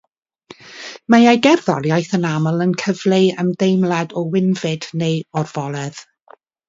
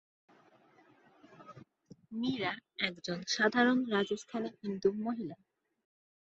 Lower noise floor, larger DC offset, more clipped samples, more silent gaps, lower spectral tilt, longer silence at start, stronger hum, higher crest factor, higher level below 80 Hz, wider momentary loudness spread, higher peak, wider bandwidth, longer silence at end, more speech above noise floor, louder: second, -49 dBFS vs -65 dBFS; neither; neither; neither; first, -6 dB/octave vs -4.5 dB/octave; second, 0.65 s vs 1.3 s; neither; about the same, 18 dB vs 22 dB; first, -62 dBFS vs -76 dBFS; second, 14 LU vs 17 LU; first, 0 dBFS vs -14 dBFS; about the same, 7.8 kHz vs 8 kHz; second, 0.65 s vs 0.95 s; about the same, 33 dB vs 31 dB; first, -17 LUFS vs -33 LUFS